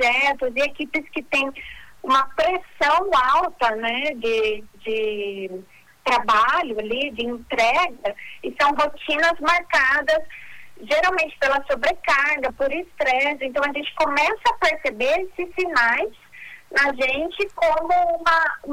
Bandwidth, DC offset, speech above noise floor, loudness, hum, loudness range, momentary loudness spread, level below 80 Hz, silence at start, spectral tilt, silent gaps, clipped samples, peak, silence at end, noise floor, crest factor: 18 kHz; under 0.1%; 21 dB; -21 LUFS; none; 2 LU; 11 LU; -50 dBFS; 0 s; -2.5 dB/octave; none; under 0.1%; -8 dBFS; 0 s; -42 dBFS; 14 dB